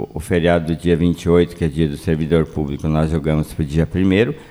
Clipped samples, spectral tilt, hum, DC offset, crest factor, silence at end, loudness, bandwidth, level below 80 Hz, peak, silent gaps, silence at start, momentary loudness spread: under 0.1%; -7.5 dB/octave; none; under 0.1%; 16 dB; 0.05 s; -18 LUFS; 13 kHz; -32 dBFS; -2 dBFS; none; 0 s; 5 LU